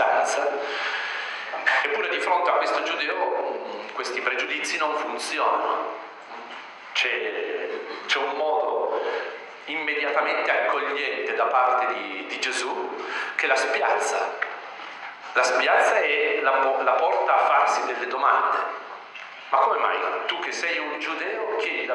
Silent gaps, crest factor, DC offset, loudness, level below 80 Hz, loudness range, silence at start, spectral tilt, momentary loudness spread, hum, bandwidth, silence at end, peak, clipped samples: none; 18 dB; under 0.1%; -24 LUFS; under -90 dBFS; 5 LU; 0 s; 0 dB/octave; 12 LU; none; 11.5 kHz; 0 s; -6 dBFS; under 0.1%